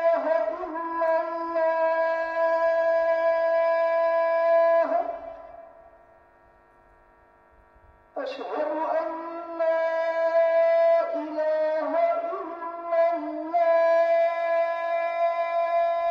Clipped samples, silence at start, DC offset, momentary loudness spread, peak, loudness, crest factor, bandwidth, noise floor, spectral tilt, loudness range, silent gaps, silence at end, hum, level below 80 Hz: under 0.1%; 0 s; under 0.1%; 11 LU; -14 dBFS; -24 LUFS; 12 dB; 6 kHz; -57 dBFS; -4.5 dB/octave; 10 LU; none; 0 s; none; -68 dBFS